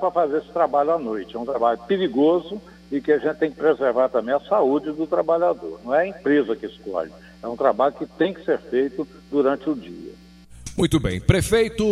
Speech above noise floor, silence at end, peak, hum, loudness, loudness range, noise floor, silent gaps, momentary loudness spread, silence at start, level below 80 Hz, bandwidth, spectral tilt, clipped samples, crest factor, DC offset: 24 dB; 0 s; -2 dBFS; none; -22 LUFS; 3 LU; -45 dBFS; none; 11 LU; 0 s; -44 dBFS; 15 kHz; -6 dB/octave; under 0.1%; 20 dB; under 0.1%